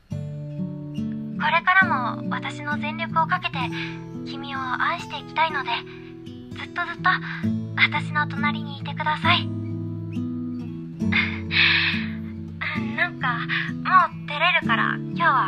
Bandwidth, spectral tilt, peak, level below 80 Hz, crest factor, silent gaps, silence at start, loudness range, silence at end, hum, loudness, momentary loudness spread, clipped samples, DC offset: 9.8 kHz; -6 dB/octave; -4 dBFS; -58 dBFS; 20 dB; none; 0.1 s; 5 LU; 0 s; none; -23 LUFS; 14 LU; under 0.1%; under 0.1%